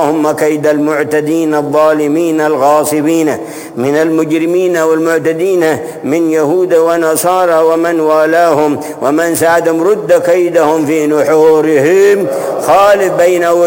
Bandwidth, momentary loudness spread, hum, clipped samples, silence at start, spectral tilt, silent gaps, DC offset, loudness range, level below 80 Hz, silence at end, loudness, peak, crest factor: 17 kHz; 5 LU; none; under 0.1%; 0 s; -5 dB/octave; none; under 0.1%; 2 LU; -54 dBFS; 0 s; -10 LUFS; 0 dBFS; 10 dB